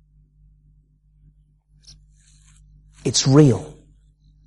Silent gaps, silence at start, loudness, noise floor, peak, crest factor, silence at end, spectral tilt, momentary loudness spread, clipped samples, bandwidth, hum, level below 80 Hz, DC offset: none; 3.05 s; -17 LUFS; -57 dBFS; -2 dBFS; 20 dB; 0.8 s; -5.5 dB/octave; 16 LU; under 0.1%; 11.5 kHz; 50 Hz at -45 dBFS; -50 dBFS; under 0.1%